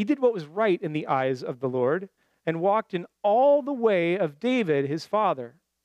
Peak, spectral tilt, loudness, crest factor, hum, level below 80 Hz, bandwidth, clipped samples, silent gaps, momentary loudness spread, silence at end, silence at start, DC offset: -10 dBFS; -7 dB/octave; -25 LUFS; 14 dB; none; -80 dBFS; 10 kHz; under 0.1%; none; 10 LU; 0.35 s; 0 s; under 0.1%